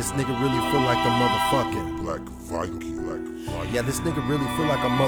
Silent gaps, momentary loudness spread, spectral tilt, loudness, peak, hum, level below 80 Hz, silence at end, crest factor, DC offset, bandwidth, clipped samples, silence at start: none; 11 LU; -5 dB/octave; -25 LUFS; -8 dBFS; none; -42 dBFS; 0 s; 16 dB; under 0.1%; over 20 kHz; under 0.1%; 0 s